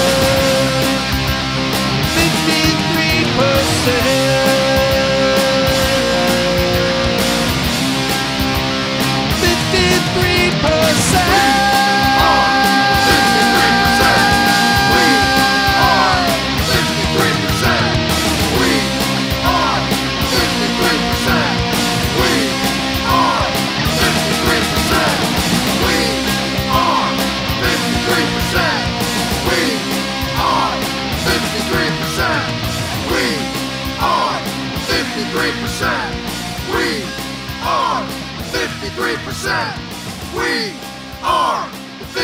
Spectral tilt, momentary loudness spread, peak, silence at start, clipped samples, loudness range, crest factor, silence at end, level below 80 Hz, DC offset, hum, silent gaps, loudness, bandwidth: -3.5 dB/octave; 9 LU; 0 dBFS; 0 s; under 0.1%; 8 LU; 16 dB; 0 s; -30 dBFS; under 0.1%; none; none; -14 LUFS; 16.5 kHz